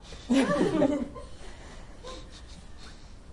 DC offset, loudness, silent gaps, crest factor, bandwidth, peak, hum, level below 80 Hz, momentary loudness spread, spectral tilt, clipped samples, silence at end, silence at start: under 0.1%; -27 LUFS; none; 20 dB; 11.5 kHz; -12 dBFS; none; -48 dBFS; 23 LU; -5.5 dB/octave; under 0.1%; 0 s; 0 s